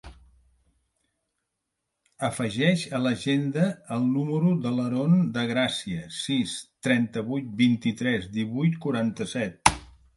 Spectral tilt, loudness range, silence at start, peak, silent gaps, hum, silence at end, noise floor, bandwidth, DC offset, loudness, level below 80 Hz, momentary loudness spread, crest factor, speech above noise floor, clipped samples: -5.5 dB/octave; 3 LU; 0.05 s; -2 dBFS; none; none; 0.3 s; -82 dBFS; 11.5 kHz; under 0.1%; -26 LUFS; -52 dBFS; 8 LU; 26 dB; 57 dB; under 0.1%